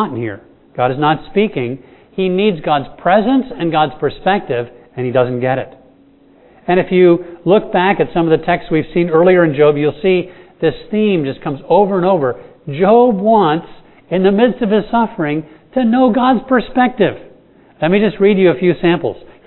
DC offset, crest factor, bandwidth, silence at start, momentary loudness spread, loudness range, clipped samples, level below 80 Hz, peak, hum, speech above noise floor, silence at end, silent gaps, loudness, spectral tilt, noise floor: under 0.1%; 14 dB; 4.2 kHz; 0 s; 12 LU; 3 LU; under 0.1%; -44 dBFS; 0 dBFS; none; 34 dB; 0.25 s; none; -14 LUFS; -11 dB/octave; -47 dBFS